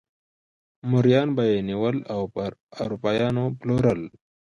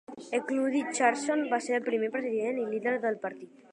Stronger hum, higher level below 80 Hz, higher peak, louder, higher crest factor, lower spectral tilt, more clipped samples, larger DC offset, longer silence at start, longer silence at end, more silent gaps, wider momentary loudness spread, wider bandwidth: neither; first, -54 dBFS vs -84 dBFS; first, -6 dBFS vs -10 dBFS; first, -24 LUFS vs -30 LUFS; about the same, 18 dB vs 20 dB; first, -8.5 dB/octave vs -3.5 dB/octave; neither; neither; first, 0.85 s vs 0.1 s; first, 0.5 s vs 0.25 s; first, 2.60-2.67 s vs none; first, 13 LU vs 7 LU; second, 7.2 kHz vs 10.5 kHz